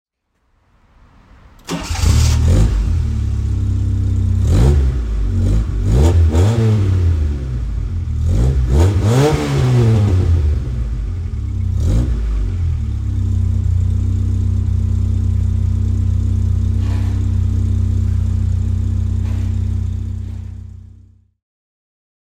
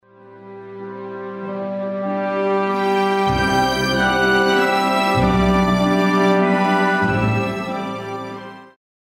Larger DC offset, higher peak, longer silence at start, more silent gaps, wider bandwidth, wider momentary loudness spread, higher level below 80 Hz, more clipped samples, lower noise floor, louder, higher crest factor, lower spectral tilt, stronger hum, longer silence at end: neither; first, 0 dBFS vs -4 dBFS; first, 1.65 s vs 0.25 s; neither; second, 10 kHz vs 16 kHz; second, 9 LU vs 16 LU; first, -20 dBFS vs -38 dBFS; neither; first, -63 dBFS vs -42 dBFS; about the same, -17 LUFS vs -18 LUFS; about the same, 16 dB vs 14 dB; about the same, -7 dB/octave vs -6 dB/octave; neither; first, 1.5 s vs 0.4 s